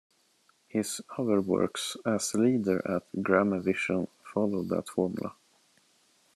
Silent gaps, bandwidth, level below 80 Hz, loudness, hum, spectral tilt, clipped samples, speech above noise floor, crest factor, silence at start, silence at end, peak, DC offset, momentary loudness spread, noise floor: none; 13 kHz; -74 dBFS; -29 LUFS; none; -5 dB/octave; under 0.1%; 39 dB; 22 dB; 0.75 s; 1.05 s; -8 dBFS; under 0.1%; 8 LU; -68 dBFS